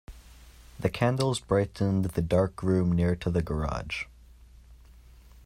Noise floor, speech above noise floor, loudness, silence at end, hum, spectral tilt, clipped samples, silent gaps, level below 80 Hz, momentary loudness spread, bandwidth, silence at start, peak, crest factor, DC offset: -52 dBFS; 26 dB; -28 LUFS; 0.7 s; none; -7 dB/octave; under 0.1%; none; -46 dBFS; 7 LU; 15.5 kHz; 0.1 s; -10 dBFS; 18 dB; under 0.1%